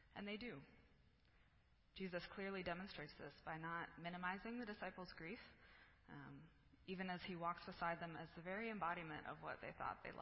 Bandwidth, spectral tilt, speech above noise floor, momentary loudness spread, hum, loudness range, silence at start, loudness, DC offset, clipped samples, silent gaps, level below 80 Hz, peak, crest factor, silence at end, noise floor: 5.6 kHz; -3.5 dB/octave; 24 dB; 15 LU; none; 4 LU; 0 s; -50 LUFS; under 0.1%; under 0.1%; none; -74 dBFS; -32 dBFS; 20 dB; 0 s; -75 dBFS